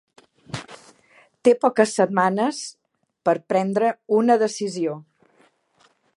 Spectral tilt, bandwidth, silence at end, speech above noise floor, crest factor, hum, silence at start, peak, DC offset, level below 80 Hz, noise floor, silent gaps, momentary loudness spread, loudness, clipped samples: -5 dB/octave; 11.5 kHz; 1.15 s; 42 dB; 20 dB; none; 0.55 s; -4 dBFS; under 0.1%; -70 dBFS; -62 dBFS; none; 17 LU; -21 LUFS; under 0.1%